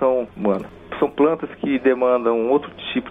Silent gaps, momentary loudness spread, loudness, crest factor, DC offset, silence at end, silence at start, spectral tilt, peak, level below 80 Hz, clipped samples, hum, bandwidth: none; 8 LU; -20 LUFS; 14 dB; under 0.1%; 0 s; 0 s; -8 dB/octave; -6 dBFS; -54 dBFS; under 0.1%; none; 3.9 kHz